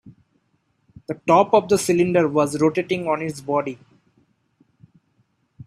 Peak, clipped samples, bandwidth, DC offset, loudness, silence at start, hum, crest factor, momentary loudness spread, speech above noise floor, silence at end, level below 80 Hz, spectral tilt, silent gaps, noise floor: -2 dBFS; under 0.1%; 14 kHz; under 0.1%; -20 LUFS; 0.05 s; none; 20 dB; 16 LU; 48 dB; 0.05 s; -62 dBFS; -5.5 dB/octave; none; -68 dBFS